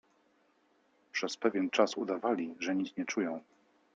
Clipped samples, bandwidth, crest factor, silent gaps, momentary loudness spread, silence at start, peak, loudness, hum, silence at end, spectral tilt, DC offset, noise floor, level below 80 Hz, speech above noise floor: under 0.1%; 8.6 kHz; 22 dB; none; 8 LU; 1.15 s; -12 dBFS; -33 LUFS; none; 0.55 s; -4 dB/octave; under 0.1%; -71 dBFS; -82 dBFS; 38 dB